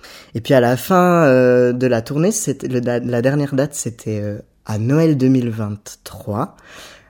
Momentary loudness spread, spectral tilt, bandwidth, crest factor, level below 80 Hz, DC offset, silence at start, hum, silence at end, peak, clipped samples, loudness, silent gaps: 16 LU; -6 dB/octave; 17.5 kHz; 16 dB; -54 dBFS; under 0.1%; 0.05 s; none; 0.2 s; -2 dBFS; under 0.1%; -17 LUFS; none